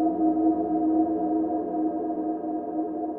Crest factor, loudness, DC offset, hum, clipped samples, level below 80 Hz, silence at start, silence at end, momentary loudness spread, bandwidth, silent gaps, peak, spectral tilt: 14 dB; -26 LUFS; under 0.1%; none; under 0.1%; -62 dBFS; 0 s; 0 s; 7 LU; 1.9 kHz; none; -12 dBFS; -12.5 dB/octave